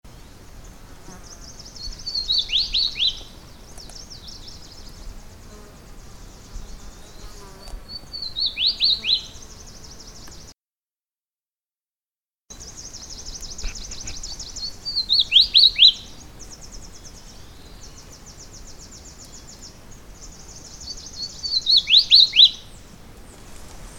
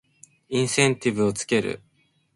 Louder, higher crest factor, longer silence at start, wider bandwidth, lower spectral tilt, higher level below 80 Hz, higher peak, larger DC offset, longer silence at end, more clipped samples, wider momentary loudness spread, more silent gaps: first, -15 LUFS vs -23 LUFS; about the same, 24 dB vs 22 dB; second, 0.05 s vs 0.5 s; first, 19 kHz vs 11.5 kHz; second, 0 dB/octave vs -4 dB/octave; first, -42 dBFS vs -60 dBFS; about the same, -2 dBFS vs -4 dBFS; neither; second, 0 s vs 0.6 s; neither; first, 29 LU vs 10 LU; first, 10.62-10.66 s, 11.34-11.38 s, 12.03-12.07 s vs none